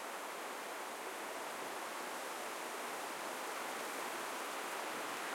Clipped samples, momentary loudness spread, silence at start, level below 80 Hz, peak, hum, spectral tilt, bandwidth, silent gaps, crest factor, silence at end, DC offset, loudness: under 0.1%; 3 LU; 0 s; under -90 dBFS; -30 dBFS; none; -1 dB/octave; 16.5 kHz; none; 14 dB; 0 s; under 0.1%; -43 LUFS